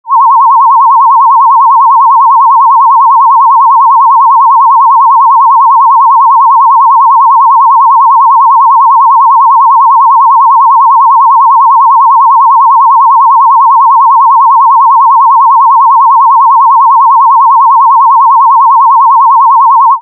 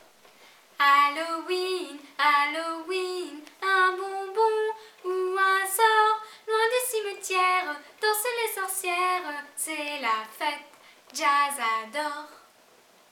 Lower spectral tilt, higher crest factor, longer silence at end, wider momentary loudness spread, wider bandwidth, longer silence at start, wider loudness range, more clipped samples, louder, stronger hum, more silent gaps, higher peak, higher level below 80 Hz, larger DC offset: second, 9 dB/octave vs 0.5 dB/octave; second, 4 dB vs 18 dB; second, 0 s vs 0.75 s; second, 0 LU vs 11 LU; second, 1.2 kHz vs 19.5 kHz; second, 0.05 s vs 0.8 s; second, 0 LU vs 4 LU; first, 0.4% vs under 0.1%; first, -3 LUFS vs -26 LUFS; neither; neither; first, 0 dBFS vs -8 dBFS; about the same, under -90 dBFS vs under -90 dBFS; neither